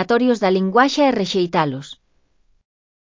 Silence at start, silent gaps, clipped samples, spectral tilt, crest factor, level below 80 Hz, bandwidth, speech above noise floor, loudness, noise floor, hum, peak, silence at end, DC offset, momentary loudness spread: 0 s; none; under 0.1%; -5.5 dB/octave; 18 dB; -60 dBFS; 7.6 kHz; 44 dB; -17 LUFS; -61 dBFS; none; -2 dBFS; 1.15 s; under 0.1%; 10 LU